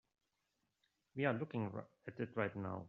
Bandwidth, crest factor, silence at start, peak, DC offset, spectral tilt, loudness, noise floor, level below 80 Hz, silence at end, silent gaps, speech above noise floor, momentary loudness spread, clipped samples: 6.6 kHz; 22 dB; 1.15 s; -22 dBFS; under 0.1%; -6.5 dB/octave; -42 LUFS; -86 dBFS; -82 dBFS; 0 s; none; 44 dB; 12 LU; under 0.1%